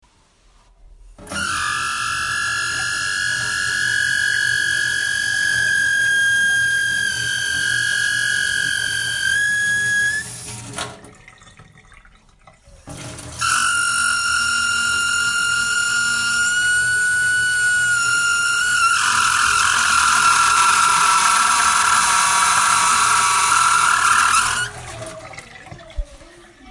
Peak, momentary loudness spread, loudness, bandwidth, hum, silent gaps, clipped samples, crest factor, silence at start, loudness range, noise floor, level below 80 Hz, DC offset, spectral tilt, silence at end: -2 dBFS; 13 LU; -16 LUFS; 11.5 kHz; none; none; under 0.1%; 16 dB; 0.85 s; 8 LU; -55 dBFS; -46 dBFS; under 0.1%; 0.5 dB/octave; 0 s